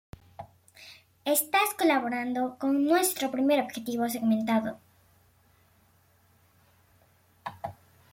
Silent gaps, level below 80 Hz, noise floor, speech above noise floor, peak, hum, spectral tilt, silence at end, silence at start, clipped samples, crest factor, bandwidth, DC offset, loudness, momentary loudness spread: none; -68 dBFS; -64 dBFS; 37 dB; -12 dBFS; none; -3.5 dB/octave; 0.4 s; 0.4 s; under 0.1%; 18 dB; 16.5 kHz; under 0.1%; -27 LUFS; 24 LU